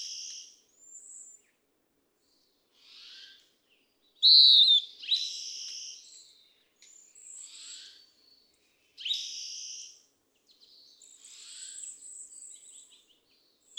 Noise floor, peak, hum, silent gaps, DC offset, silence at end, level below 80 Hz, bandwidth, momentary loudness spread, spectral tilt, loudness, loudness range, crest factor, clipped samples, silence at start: -74 dBFS; -8 dBFS; none; none; under 0.1%; 1.55 s; under -90 dBFS; 15.5 kHz; 31 LU; 5.5 dB/octave; -22 LUFS; 24 LU; 24 dB; under 0.1%; 0 s